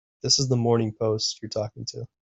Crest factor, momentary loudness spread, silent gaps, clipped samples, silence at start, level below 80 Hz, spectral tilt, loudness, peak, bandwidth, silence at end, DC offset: 20 dB; 12 LU; none; under 0.1%; 0.25 s; -60 dBFS; -4.5 dB/octave; -24 LUFS; -6 dBFS; 8.4 kHz; 0.2 s; under 0.1%